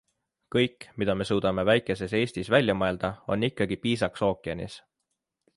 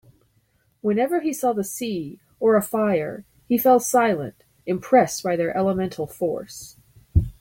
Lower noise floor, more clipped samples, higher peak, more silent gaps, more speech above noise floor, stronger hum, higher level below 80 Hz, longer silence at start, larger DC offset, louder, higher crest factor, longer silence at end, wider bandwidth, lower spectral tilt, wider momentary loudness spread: first, -82 dBFS vs -65 dBFS; neither; about the same, -8 dBFS vs -6 dBFS; neither; first, 55 dB vs 43 dB; neither; second, -52 dBFS vs -40 dBFS; second, 0.5 s vs 0.85 s; neither; second, -27 LUFS vs -22 LUFS; about the same, 20 dB vs 18 dB; first, 0.8 s vs 0.1 s; second, 11.5 kHz vs 17 kHz; about the same, -6 dB/octave vs -5.5 dB/octave; second, 9 LU vs 17 LU